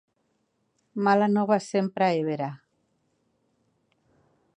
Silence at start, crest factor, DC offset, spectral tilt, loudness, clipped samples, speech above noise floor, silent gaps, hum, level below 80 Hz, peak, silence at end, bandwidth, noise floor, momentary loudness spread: 0.95 s; 20 dB; under 0.1%; -6.5 dB/octave; -25 LUFS; under 0.1%; 49 dB; none; none; -78 dBFS; -8 dBFS; 2 s; 10 kHz; -73 dBFS; 11 LU